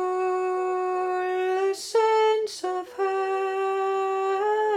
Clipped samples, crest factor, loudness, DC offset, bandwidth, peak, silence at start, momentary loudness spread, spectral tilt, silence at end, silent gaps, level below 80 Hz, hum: under 0.1%; 14 dB; -25 LUFS; under 0.1%; 13 kHz; -12 dBFS; 0 s; 5 LU; -2 dB/octave; 0 s; none; -74 dBFS; none